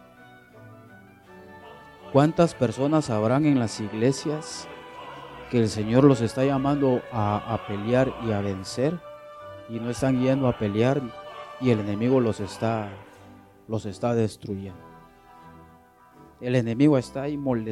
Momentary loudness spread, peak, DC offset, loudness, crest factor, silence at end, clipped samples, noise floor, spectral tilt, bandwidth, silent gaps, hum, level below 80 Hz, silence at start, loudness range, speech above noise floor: 19 LU; -4 dBFS; under 0.1%; -24 LUFS; 22 dB; 0 s; under 0.1%; -53 dBFS; -7 dB/octave; 12.5 kHz; none; none; -56 dBFS; 0.55 s; 7 LU; 30 dB